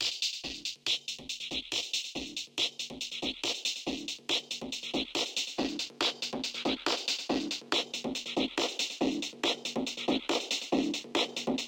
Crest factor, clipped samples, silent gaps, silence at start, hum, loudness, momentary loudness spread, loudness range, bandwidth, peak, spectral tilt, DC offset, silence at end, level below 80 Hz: 20 dB; under 0.1%; none; 0 s; none; -32 LUFS; 5 LU; 2 LU; 17 kHz; -14 dBFS; -1.5 dB/octave; under 0.1%; 0 s; -64 dBFS